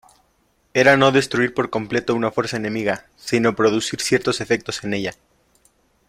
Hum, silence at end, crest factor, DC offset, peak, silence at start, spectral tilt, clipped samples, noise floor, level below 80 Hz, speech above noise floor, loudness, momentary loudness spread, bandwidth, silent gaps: none; 0.95 s; 20 dB; under 0.1%; -2 dBFS; 0.75 s; -4.5 dB/octave; under 0.1%; -63 dBFS; -56 dBFS; 44 dB; -20 LUFS; 10 LU; 15.5 kHz; none